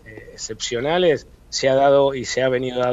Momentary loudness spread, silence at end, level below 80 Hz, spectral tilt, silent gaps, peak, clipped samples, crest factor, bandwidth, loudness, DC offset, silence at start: 14 LU; 0 s; -48 dBFS; -4 dB/octave; none; -6 dBFS; under 0.1%; 14 dB; 8 kHz; -19 LUFS; under 0.1%; 0.05 s